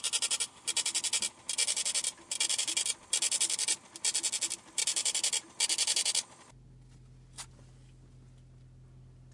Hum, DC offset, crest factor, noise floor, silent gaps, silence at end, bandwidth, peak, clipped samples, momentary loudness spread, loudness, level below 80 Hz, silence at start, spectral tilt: none; under 0.1%; 20 dB; -55 dBFS; none; 0 s; 11.5 kHz; -14 dBFS; under 0.1%; 6 LU; -29 LUFS; -66 dBFS; 0 s; 1.5 dB/octave